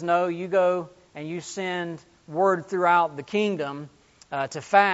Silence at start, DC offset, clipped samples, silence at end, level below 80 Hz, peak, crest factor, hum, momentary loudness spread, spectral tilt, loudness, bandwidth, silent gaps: 0 s; under 0.1%; under 0.1%; 0 s; -70 dBFS; -4 dBFS; 22 dB; none; 17 LU; -3.5 dB/octave; -25 LUFS; 8 kHz; none